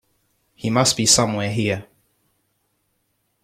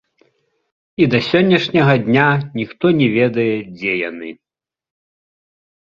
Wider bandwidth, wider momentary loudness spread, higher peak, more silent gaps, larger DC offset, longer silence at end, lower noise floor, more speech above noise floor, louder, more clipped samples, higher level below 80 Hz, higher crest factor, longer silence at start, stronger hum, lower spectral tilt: first, 15.5 kHz vs 7.2 kHz; about the same, 13 LU vs 12 LU; about the same, -2 dBFS vs -2 dBFS; neither; neither; about the same, 1.6 s vs 1.5 s; first, -70 dBFS vs -63 dBFS; about the same, 51 dB vs 48 dB; about the same, -18 LUFS vs -16 LUFS; neither; about the same, -54 dBFS vs -54 dBFS; first, 22 dB vs 16 dB; second, 0.65 s vs 1 s; neither; second, -3 dB/octave vs -7.5 dB/octave